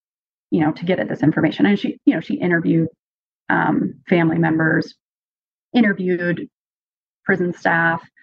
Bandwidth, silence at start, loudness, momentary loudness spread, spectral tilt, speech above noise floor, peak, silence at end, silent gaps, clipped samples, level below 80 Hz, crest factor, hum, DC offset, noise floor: 7 kHz; 0.5 s; -19 LUFS; 6 LU; -8.5 dB/octave; over 72 dB; -2 dBFS; 0.2 s; 2.99-3.45 s, 5.00-5.71 s, 6.53-7.23 s; under 0.1%; -66 dBFS; 18 dB; none; under 0.1%; under -90 dBFS